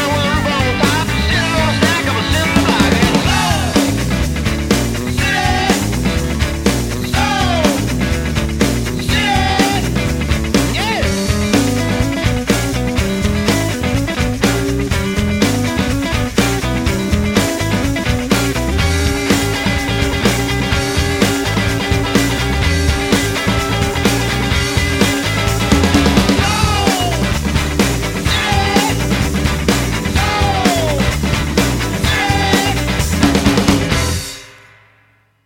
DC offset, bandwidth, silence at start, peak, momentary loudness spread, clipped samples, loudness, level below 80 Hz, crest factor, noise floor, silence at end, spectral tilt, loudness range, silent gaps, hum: under 0.1%; 17 kHz; 0 s; 0 dBFS; 4 LU; under 0.1%; -15 LUFS; -24 dBFS; 14 dB; -54 dBFS; 0.9 s; -4.5 dB/octave; 2 LU; none; none